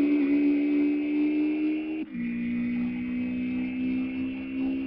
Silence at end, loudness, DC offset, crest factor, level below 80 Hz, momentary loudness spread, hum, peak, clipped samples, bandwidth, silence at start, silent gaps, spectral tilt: 0 s; -28 LUFS; under 0.1%; 12 dB; -58 dBFS; 8 LU; none; -16 dBFS; under 0.1%; 5.2 kHz; 0 s; none; -10.5 dB/octave